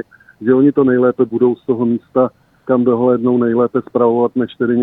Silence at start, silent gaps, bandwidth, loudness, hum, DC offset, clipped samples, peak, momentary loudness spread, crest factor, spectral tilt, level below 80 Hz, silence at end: 0.4 s; none; 4 kHz; -15 LUFS; none; under 0.1%; under 0.1%; -2 dBFS; 6 LU; 14 dB; -11 dB/octave; -56 dBFS; 0 s